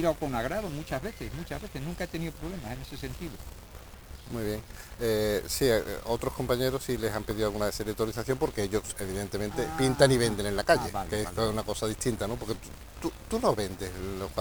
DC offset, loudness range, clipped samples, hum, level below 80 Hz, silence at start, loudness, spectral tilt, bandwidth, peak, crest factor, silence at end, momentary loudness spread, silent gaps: 0.2%; 10 LU; under 0.1%; none; -44 dBFS; 0 s; -31 LUFS; -5 dB/octave; over 20 kHz; -6 dBFS; 24 dB; 0 s; 13 LU; none